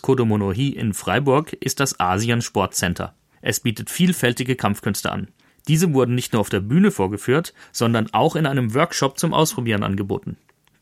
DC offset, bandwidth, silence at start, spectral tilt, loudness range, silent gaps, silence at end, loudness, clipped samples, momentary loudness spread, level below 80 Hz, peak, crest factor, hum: under 0.1%; 16.5 kHz; 0.05 s; -5 dB/octave; 2 LU; none; 0.45 s; -21 LUFS; under 0.1%; 8 LU; -52 dBFS; -2 dBFS; 18 dB; none